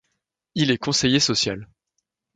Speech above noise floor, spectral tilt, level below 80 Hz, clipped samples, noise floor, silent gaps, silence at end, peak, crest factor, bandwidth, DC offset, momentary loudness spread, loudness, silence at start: 56 dB; -3.5 dB/octave; -54 dBFS; under 0.1%; -78 dBFS; none; 0.7 s; -4 dBFS; 20 dB; 9.6 kHz; under 0.1%; 12 LU; -20 LUFS; 0.55 s